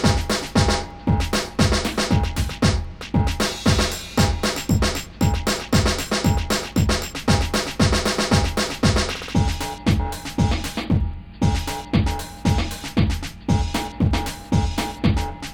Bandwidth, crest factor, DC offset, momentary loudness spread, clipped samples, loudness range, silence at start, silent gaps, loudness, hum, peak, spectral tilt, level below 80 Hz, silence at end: 19.5 kHz; 16 dB; 0.2%; 5 LU; under 0.1%; 3 LU; 0 s; none; -22 LUFS; none; -4 dBFS; -5 dB/octave; -28 dBFS; 0 s